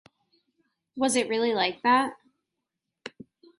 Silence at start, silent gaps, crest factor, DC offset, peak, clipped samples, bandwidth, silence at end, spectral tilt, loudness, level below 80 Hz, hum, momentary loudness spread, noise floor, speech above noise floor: 0.95 s; none; 18 dB; under 0.1%; -10 dBFS; under 0.1%; 11.5 kHz; 0.5 s; -2.5 dB/octave; -25 LUFS; -74 dBFS; none; 22 LU; -85 dBFS; 60 dB